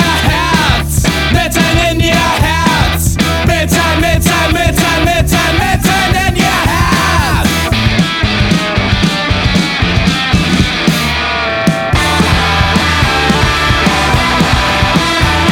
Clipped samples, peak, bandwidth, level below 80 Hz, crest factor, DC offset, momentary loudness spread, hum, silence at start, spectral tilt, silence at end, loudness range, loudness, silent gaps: under 0.1%; 0 dBFS; 19.5 kHz; -20 dBFS; 10 dB; under 0.1%; 2 LU; none; 0 s; -4.5 dB/octave; 0 s; 1 LU; -10 LUFS; none